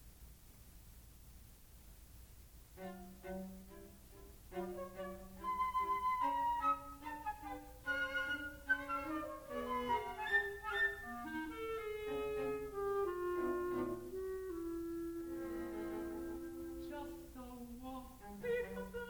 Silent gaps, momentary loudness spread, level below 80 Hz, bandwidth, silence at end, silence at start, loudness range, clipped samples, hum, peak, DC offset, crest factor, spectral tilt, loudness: none; 23 LU; -60 dBFS; over 20 kHz; 0 s; 0 s; 14 LU; under 0.1%; none; -24 dBFS; under 0.1%; 20 dB; -5 dB/octave; -41 LUFS